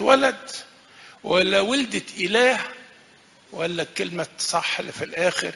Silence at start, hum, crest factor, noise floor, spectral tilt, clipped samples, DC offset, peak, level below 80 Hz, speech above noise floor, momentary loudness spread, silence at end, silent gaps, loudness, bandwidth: 0 s; none; 22 dB; -53 dBFS; -3 dB/octave; under 0.1%; under 0.1%; -2 dBFS; -62 dBFS; 31 dB; 16 LU; 0 s; none; -22 LUFS; 11.5 kHz